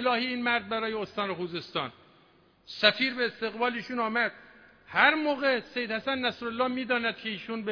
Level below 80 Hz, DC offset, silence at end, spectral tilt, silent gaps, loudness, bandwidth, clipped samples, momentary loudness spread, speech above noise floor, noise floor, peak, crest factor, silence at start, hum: -70 dBFS; under 0.1%; 0 s; -5 dB/octave; none; -28 LUFS; 5.4 kHz; under 0.1%; 11 LU; 33 dB; -62 dBFS; -4 dBFS; 24 dB; 0 s; none